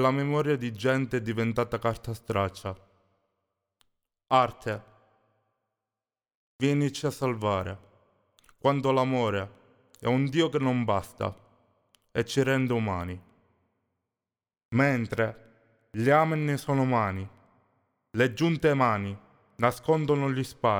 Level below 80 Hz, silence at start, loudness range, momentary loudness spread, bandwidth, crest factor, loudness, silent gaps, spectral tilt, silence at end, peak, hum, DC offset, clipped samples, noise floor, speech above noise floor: -60 dBFS; 0 s; 5 LU; 12 LU; 19 kHz; 20 dB; -27 LUFS; 6.35-6.59 s, 14.65-14.69 s; -6.5 dB/octave; 0 s; -8 dBFS; none; under 0.1%; under 0.1%; under -90 dBFS; over 64 dB